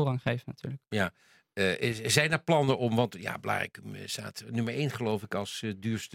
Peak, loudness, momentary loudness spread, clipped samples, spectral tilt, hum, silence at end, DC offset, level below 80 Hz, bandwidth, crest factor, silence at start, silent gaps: -6 dBFS; -30 LUFS; 11 LU; under 0.1%; -4.5 dB/octave; none; 0 s; under 0.1%; -66 dBFS; 16.5 kHz; 24 dB; 0 s; none